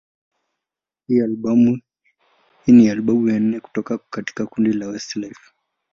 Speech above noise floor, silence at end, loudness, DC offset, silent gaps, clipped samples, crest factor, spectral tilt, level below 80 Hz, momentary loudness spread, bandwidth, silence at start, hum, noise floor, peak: 69 dB; 0.65 s; -19 LUFS; under 0.1%; none; under 0.1%; 18 dB; -7 dB/octave; -58 dBFS; 16 LU; 7.2 kHz; 1.1 s; none; -87 dBFS; -2 dBFS